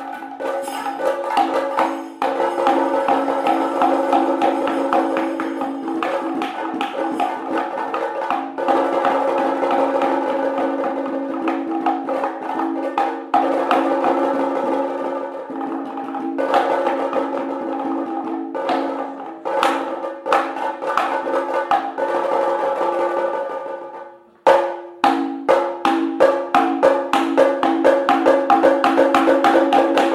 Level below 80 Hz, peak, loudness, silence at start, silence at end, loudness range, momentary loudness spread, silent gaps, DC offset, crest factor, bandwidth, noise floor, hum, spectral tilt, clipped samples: -70 dBFS; -2 dBFS; -19 LUFS; 0 s; 0 s; 6 LU; 10 LU; none; under 0.1%; 18 dB; 13.5 kHz; -39 dBFS; none; -4.5 dB/octave; under 0.1%